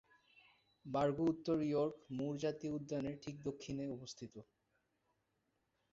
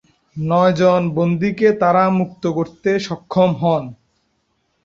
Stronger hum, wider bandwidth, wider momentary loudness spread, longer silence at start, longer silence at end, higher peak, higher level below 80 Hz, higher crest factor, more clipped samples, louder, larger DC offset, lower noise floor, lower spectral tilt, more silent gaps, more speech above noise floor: neither; about the same, 7.6 kHz vs 7.6 kHz; first, 15 LU vs 8 LU; first, 0.85 s vs 0.35 s; first, 1.5 s vs 0.9 s; second, -24 dBFS vs -2 dBFS; second, -72 dBFS vs -56 dBFS; about the same, 18 dB vs 16 dB; neither; second, -41 LUFS vs -17 LUFS; neither; first, -84 dBFS vs -67 dBFS; about the same, -7 dB/octave vs -7.5 dB/octave; neither; second, 44 dB vs 50 dB